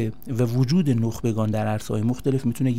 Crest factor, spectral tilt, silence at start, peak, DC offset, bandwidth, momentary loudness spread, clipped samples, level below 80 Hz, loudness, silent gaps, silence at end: 14 dB; -7.5 dB/octave; 0 s; -10 dBFS; 1%; 16 kHz; 5 LU; under 0.1%; -50 dBFS; -23 LUFS; none; 0 s